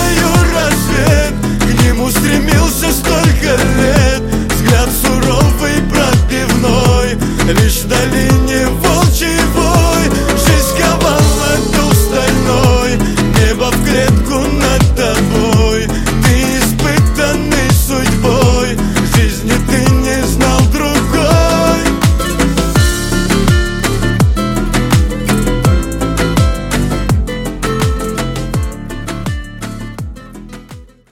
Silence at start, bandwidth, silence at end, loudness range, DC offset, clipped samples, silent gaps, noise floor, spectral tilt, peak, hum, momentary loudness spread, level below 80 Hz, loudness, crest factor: 0 s; 17 kHz; 0.25 s; 4 LU; under 0.1%; under 0.1%; none; -34 dBFS; -5 dB/octave; 0 dBFS; none; 6 LU; -18 dBFS; -12 LUFS; 10 dB